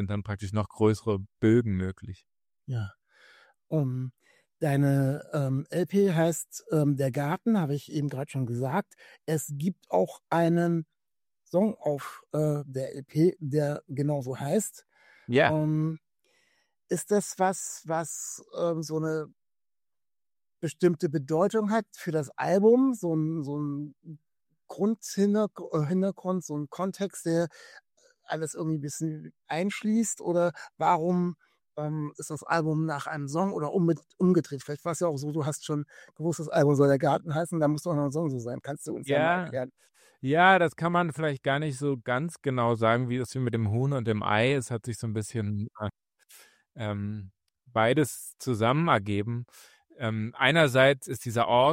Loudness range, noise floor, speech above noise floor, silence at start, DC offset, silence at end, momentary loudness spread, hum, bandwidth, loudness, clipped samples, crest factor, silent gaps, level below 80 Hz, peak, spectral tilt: 5 LU; under -90 dBFS; over 63 dB; 0 s; under 0.1%; 0 s; 12 LU; none; 16 kHz; -28 LUFS; under 0.1%; 22 dB; none; -66 dBFS; -6 dBFS; -6 dB/octave